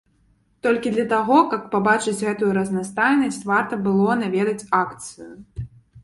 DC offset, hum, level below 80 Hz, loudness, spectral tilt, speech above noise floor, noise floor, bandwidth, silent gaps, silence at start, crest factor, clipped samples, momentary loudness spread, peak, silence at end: under 0.1%; none; -52 dBFS; -20 LUFS; -5.5 dB/octave; 41 dB; -61 dBFS; 11.5 kHz; none; 0.65 s; 18 dB; under 0.1%; 18 LU; -2 dBFS; 0.05 s